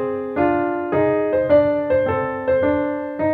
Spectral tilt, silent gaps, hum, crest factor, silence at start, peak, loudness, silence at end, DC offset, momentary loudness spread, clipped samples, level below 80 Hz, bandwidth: -10 dB/octave; none; none; 14 dB; 0 s; -4 dBFS; -19 LUFS; 0 s; under 0.1%; 6 LU; under 0.1%; -50 dBFS; 4.5 kHz